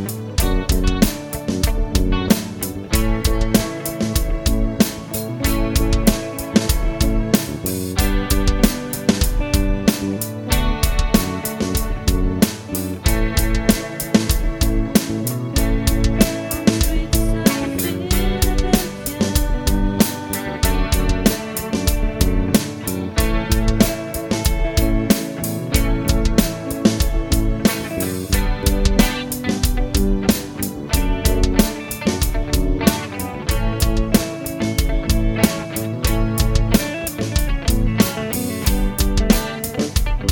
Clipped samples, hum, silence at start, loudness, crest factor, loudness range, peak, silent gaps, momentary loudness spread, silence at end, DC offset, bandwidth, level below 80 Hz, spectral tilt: under 0.1%; none; 0 s; -20 LUFS; 18 dB; 1 LU; 0 dBFS; none; 6 LU; 0 s; under 0.1%; 17.5 kHz; -22 dBFS; -5 dB/octave